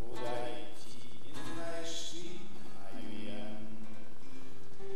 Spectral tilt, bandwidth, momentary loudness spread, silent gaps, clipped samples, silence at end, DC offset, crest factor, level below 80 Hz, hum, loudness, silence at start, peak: -4 dB/octave; 16.5 kHz; 13 LU; none; under 0.1%; 0 s; 5%; 18 dB; -68 dBFS; none; -45 LUFS; 0 s; -20 dBFS